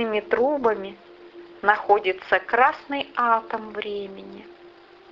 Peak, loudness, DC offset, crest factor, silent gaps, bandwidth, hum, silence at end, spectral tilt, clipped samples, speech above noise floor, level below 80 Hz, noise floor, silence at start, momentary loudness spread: -2 dBFS; -23 LUFS; under 0.1%; 22 dB; none; 6.8 kHz; none; 0.4 s; -5.5 dB/octave; under 0.1%; 25 dB; -62 dBFS; -49 dBFS; 0 s; 17 LU